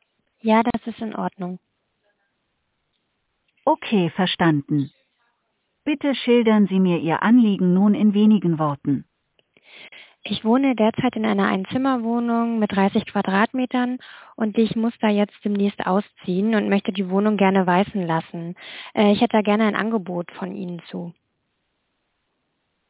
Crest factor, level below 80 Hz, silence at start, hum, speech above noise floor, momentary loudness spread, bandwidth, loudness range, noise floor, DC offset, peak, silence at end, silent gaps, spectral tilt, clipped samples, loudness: 18 dB; -62 dBFS; 0.45 s; none; 53 dB; 14 LU; 4 kHz; 7 LU; -73 dBFS; under 0.1%; -4 dBFS; 1.8 s; none; -11 dB/octave; under 0.1%; -21 LUFS